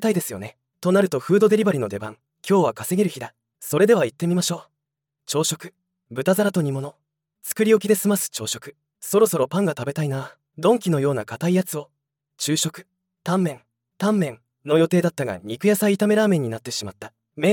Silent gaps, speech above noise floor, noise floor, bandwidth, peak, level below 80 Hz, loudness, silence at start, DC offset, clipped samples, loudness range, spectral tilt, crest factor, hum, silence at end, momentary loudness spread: none; 62 dB; -83 dBFS; 18 kHz; -4 dBFS; -70 dBFS; -22 LUFS; 0 s; under 0.1%; under 0.1%; 3 LU; -5 dB/octave; 18 dB; none; 0 s; 17 LU